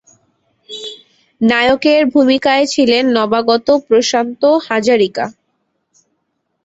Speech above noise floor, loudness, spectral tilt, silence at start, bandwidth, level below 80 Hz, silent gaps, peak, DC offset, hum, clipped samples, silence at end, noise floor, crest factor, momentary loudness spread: 57 dB; -13 LUFS; -3.5 dB/octave; 0.7 s; 8.2 kHz; -54 dBFS; none; 0 dBFS; under 0.1%; none; under 0.1%; 1.35 s; -69 dBFS; 14 dB; 14 LU